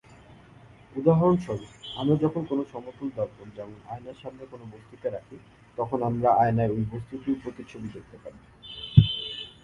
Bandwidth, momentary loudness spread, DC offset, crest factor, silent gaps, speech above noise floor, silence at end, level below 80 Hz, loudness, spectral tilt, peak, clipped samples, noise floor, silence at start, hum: 7.6 kHz; 22 LU; under 0.1%; 26 dB; none; 24 dB; 0.15 s; -48 dBFS; -26 LUFS; -8.5 dB/octave; 0 dBFS; under 0.1%; -52 dBFS; 0.95 s; none